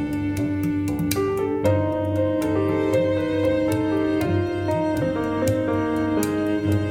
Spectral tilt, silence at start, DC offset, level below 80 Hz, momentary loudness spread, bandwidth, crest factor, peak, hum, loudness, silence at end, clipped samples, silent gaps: -7 dB/octave; 0 s; under 0.1%; -46 dBFS; 3 LU; 17 kHz; 18 dB; -4 dBFS; none; -22 LUFS; 0 s; under 0.1%; none